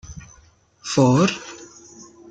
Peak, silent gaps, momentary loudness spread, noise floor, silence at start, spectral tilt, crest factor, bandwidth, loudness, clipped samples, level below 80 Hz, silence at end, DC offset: -4 dBFS; none; 26 LU; -54 dBFS; 0.05 s; -5.5 dB/octave; 20 dB; 9.2 kHz; -18 LUFS; under 0.1%; -52 dBFS; 0.65 s; under 0.1%